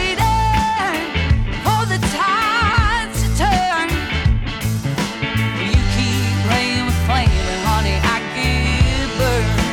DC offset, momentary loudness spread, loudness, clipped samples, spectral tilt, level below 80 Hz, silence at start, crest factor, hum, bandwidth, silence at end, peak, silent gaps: under 0.1%; 4 LU; -17 LUFS; under 0.1%; -5 dB/octave; -22 dBFS; 0 s; 14 dB; none; 17.5 kHz; 0 s; -4 dBFS; none